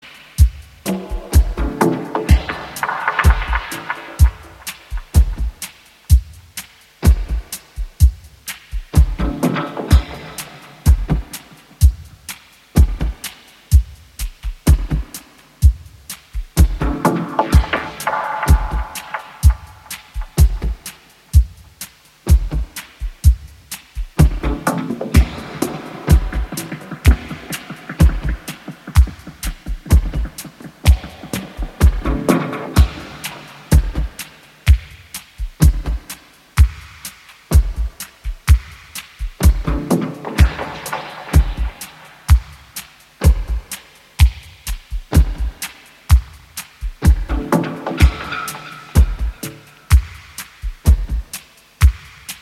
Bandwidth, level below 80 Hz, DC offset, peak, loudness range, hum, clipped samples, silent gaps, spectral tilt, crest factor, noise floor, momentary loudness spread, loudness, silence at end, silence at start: 15 kHz; -18 dBFS; under 0.1%; 0 dBFS; 2 LU; none; under 0.1%; none; -6 dB/octave; 18 dB; -38 dBFS; 16 LU; -18 LUFS; 0.05 s; 0.05 s